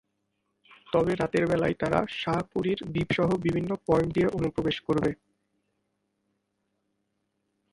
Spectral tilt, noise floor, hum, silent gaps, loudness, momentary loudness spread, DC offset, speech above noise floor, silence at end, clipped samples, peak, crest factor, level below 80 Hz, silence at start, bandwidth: -7 dB/octave; -78 dBFS; none; none; -27 LUFS; 4 LU; under 0.1%; 51 dB; 2.6 s; under 0.1%; -10 dBFS; 20 dB; -52 dBFS; 0.9 s; 11.5 kHz